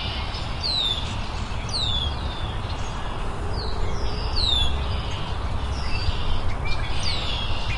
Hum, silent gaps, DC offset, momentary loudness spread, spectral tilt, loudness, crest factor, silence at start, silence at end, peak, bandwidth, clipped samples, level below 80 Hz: none; none; under 0.1%; 8 LU; -4.5 dB/octave; -26 LUFS; 14 dB; 0 s; 0 s; -8 dBFS; 11.5 kHz; under 0.1%; -28 dBFS